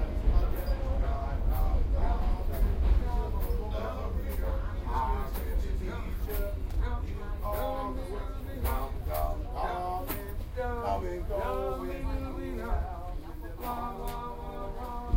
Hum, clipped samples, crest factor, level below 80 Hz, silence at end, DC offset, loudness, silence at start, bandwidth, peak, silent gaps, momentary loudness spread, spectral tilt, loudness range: none; under 0.1%; 16 dB; -32 dBFS; 0 s; under 0.1%; -34 LUFS; 0 s; 16 kHz; -14 dBFS; none; 8 LU; -7 dB/octave; 4 LU